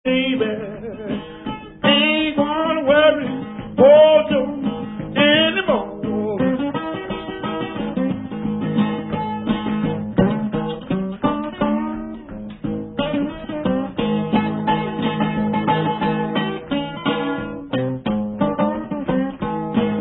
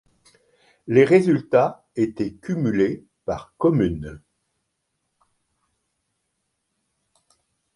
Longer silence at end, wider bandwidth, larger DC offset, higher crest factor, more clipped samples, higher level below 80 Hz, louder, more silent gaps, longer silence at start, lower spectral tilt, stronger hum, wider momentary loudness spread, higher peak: second, 0 s vs 3.6 s; second, 4.1 kHz vs 11 kHz; neither; about the same, 18 dB vs 22 dB; neither; about the same, -46 dBFS vs -50 dBFS; about the same, -20 LUFS vs -21 LUFS; neither; second, 0.05 s vs 0.85 s; first, -11 dB/octave vs -8 dB/octave; neither; about the same, 13 LU vs 15 LU; about the same, 0 dBFS vs -2 dBFS